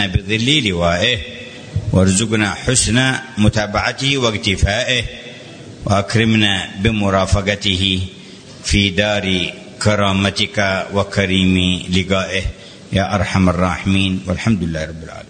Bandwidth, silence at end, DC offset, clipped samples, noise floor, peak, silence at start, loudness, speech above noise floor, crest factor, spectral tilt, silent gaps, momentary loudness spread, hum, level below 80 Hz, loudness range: 9.6 kHz; 0.05 s; under 0.1%; under 0.1%; -37 dBFS; 0 dBFS; 0 s; -16 LUFS; 21 dB; 16 dB; -4.5 dB/octave; none; 12 LU; none; -32 dBFS; 2 LU